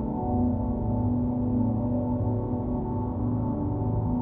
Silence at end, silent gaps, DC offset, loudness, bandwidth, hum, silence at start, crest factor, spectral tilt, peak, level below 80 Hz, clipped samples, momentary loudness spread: 0 s; none; under 0.1%; -28 LUFS; 2.1 kHz; none; 0 s; 12 dB; -15 dB/octave; -14 dBFS; -38 dBFS; under 0.1%; 3 LU